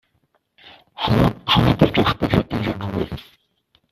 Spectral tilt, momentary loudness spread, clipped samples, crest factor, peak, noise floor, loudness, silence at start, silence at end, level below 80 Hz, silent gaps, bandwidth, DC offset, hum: -7 dB/octave; 10 LU; under 0.1%; 20 dB; 0 dBFS; -66 dBFS; -19 LUFS; 0.65 s; 0.7 s; -38 dBFS; none; 14.5 kHz; under 0.1%; none